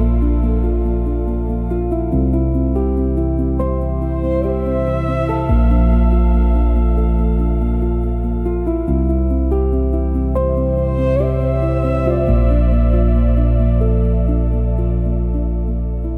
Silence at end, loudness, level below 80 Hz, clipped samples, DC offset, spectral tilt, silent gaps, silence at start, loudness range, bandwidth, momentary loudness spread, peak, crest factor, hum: 0 s; -17 LUFS; -16 dBFS; under 0.1%; under 0.1%; -11 dB/octave; none; 0 s; 3 LU; 3.5 kHz; 5 LU; -2 dBFS; 12 dB; none